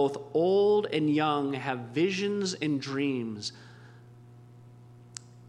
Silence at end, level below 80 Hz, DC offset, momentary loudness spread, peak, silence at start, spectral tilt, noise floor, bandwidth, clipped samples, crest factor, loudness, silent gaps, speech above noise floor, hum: 0.05 s; -74 dBFS; under 0.1%; 14 LU; -14 dBFS; 0 s; -5.5 dB/octave; -51 dBFS; 10.5 kHz; under 0.1%; 16 dB; -28 LUFS; none; 24 dB; 60 Hz at -50 dBFS